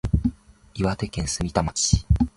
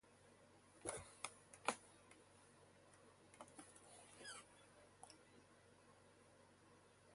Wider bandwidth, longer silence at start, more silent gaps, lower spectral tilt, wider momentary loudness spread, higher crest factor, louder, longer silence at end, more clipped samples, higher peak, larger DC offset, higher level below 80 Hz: about the same, 11.5 kHz vs 11.5 kHz; about the same, 0.05 s vs 0.05 s; neither; first, -5 dB/octave vs -2 dB/octave; second, 7 LU vs 20 LU; second, 20 dB vs 36 dB; first, -24 LUFS vs -55 LUFS; about the same, 0.1 s vs 0 s; neither; first, -2 dBFS vs -22 dBFS; neither; first, -30 dBFS vs -80 dBFS